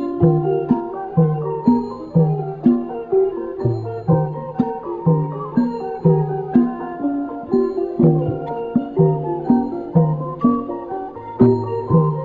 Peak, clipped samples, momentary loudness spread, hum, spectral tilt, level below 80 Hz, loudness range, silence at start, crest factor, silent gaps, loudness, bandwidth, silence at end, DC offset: -2 dBFS; under 0.1%; 7 LU; none; -12.5 dB/octave; -48 dBFS; 2 LU; 0 s; 16 dB; none; -19 LUFS; 4.5 kHz; 0 s; under 0.1%